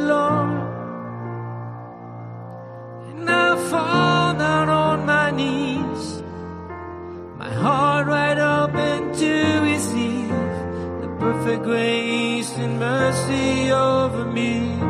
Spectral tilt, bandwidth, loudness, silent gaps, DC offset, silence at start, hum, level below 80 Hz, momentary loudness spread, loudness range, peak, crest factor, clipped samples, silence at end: -5.5 dB/octave; 13.5 kHz; -20 LUFS; none; under 0.1%; 0 s; none; -54 dBFS; 16 LU; 4 LU; -4 dBFS; 16 dB; under 0.1%; 0 s